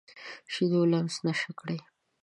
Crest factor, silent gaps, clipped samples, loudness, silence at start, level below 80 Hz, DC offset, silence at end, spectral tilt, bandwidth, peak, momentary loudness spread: 14 dB; none; under 0.1%; -29 LUFS; 0.15 s; -78 dBFS; under 0.1%; 0.45 s; -6 dB/octave; 11 kHz; -16 dBFS; 15 LU